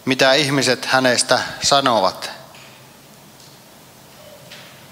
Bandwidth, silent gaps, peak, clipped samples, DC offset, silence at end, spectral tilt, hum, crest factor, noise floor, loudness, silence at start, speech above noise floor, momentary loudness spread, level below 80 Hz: 16 kHz; none; 0 dBFS; under 0.1%; under 0.1%; 0.25 s; -2.5 dB/octave; none; 20 dB; -45 dBFS; -16 LUFS; 0.05 s; 28 dB; 24 LU; -58 dBFS